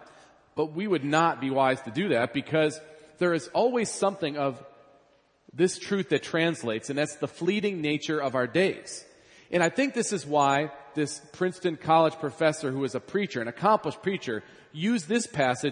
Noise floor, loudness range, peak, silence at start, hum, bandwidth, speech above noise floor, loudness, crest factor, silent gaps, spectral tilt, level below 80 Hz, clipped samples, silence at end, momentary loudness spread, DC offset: -64 dBFS; 3 LU; -8 dBFS; 0 s; none; 10.5 kHz; 37 dB; -27 LUFS; 20 dB; none; -5 dB/octave; -72 dBFS; under 0.1%; 0 s; 8 LU; under 0.1%